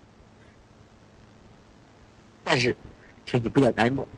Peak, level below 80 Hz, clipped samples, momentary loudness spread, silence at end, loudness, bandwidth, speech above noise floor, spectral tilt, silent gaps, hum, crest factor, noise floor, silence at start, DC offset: -4 dBFS; -54 dBFS; under 0.1%; 16 LU; 0 s; -25 LUFS; 10.5 kHz; 30 dB; -5.5 dB/octave; none; none; 24 dB; -54 dBFS; 2.45 s; under 0.1%